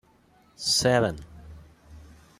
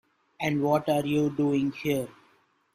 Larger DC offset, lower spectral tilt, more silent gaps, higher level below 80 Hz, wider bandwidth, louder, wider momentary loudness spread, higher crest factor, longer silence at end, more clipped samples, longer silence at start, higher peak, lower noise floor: neither; second, -3.5 dB/octave vs -6.5 dB/octave; neither; first, -52 dBFS vs -64 dBFS; about the same, 15.5 kHz vs 15 kHz; first, -24 LUFS vs -27 LUFS; first, 22 LU vs 6 LU; about the same, 20 dB vs 16 dB; second, 0.35 s vs 0.65 s; neither; first, 0.6 s vs 0.4 s; about the same, -10 dBFS vs -10 dBFS; second, -60 dBFS vs -65 dBFS